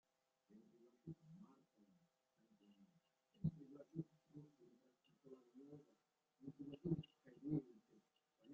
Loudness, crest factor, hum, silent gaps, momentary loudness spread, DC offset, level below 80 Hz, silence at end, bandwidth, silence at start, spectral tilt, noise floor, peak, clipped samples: -51 LUFS; 24 dB; none; none; 19 LU; under 0.1%; -82 dBFS; 0 s; 7.2 kHz; 0.5 s; -10 dB/octave; -84 dBFS; -30 dBFS; under 0.1%